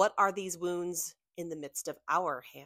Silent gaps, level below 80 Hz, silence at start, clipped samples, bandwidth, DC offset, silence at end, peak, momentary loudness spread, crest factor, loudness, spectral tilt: none; -78 dBFS; 0 s; under 0.1%; 16 kHz; under 0.1%; 0 s; -12 dBFS; 11 LU; 20 dB; -34 LUFS; -3 dB/octave